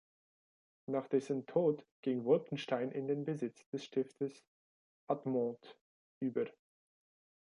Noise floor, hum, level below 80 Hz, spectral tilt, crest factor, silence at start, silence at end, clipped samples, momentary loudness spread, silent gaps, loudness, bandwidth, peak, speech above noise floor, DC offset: under -90 dBFS; none; -86 dBFS; -7.5 dB/octave; 20 dB; 0.9 s; 1 s; under 0.1%; 9 LU; 1.91-2.03 s, 3.66-3.73 s, 4.48-5.07 s, 5.81-6.21 s; -38 LUFS; 11 kHz; -18 dBFS; over 53 dB; under 0.1%